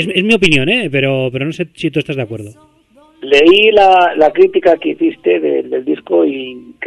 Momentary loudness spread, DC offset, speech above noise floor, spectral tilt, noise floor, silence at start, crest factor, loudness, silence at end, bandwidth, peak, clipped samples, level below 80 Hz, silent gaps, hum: 13 LU; under 0.1%; 36 dB; -5.5 dB/octave; -48 dBFS; 0 s; 12 dB; -12 LUFS; 0 s; 11.5 kHz; 0 dBFS; 0.1%; -48 dBFS; none; none